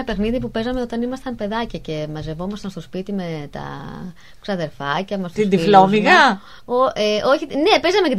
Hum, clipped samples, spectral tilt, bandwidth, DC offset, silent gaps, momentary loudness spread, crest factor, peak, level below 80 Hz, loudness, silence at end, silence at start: none; under 0.1%; -5.5 dB/octave; 14 kHz; 0.8%; none; 18 LU; 20 dB; 0 dBFS; -42 dBFS; -18 LUFS; 0 s; 0 s